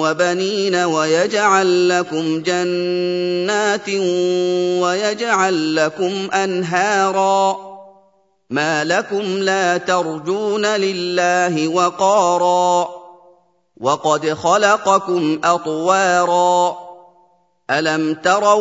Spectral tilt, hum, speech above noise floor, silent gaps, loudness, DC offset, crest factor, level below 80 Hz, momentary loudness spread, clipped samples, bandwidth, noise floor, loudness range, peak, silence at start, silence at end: -4 dB/octave; none; 41 dB; none; -17 LUFS; under 0.1%; 16 dB; -68 dBFS; 6 LU; under 0.1%; 8 kHz; -58 dBFS; 2 LU; 0 dBFS; 0 s; 0 s